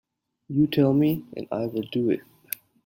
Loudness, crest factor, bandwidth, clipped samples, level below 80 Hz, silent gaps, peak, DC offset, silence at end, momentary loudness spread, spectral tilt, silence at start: -25 LUFS; 20 dB; 16.5 kHz; under 0.1%; -62 dBFS; none; -6 dBFS; under 0.1%; 0.65 s; 14 LU; -7.5 dB/octave; 0.5 s